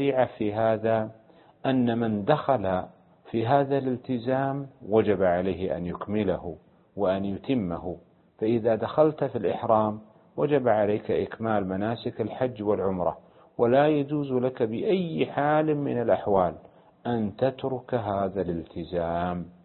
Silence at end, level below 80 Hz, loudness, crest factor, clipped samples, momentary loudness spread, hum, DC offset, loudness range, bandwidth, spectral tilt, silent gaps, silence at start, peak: 0.15 s; -54 dBFS; -26 LUFS; 20 dB; under 0.1%; 9 LU; none; under 0.1%; 3 LU; 4.3 kHz; -11.5 dB/octave; none; 0 s; -6 dBFS